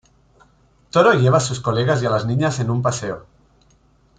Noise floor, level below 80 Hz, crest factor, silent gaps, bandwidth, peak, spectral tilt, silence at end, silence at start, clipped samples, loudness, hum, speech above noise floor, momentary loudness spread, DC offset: -56 dBFS; -50 dBFS; 18 dB; none; 9.4 kHz; -2 dBFS; -5.5 dB/octave; 1 s; 0.95 s; under 0.1%; -18 LUFS; none; 39 dB; 10 LU; under 0.1%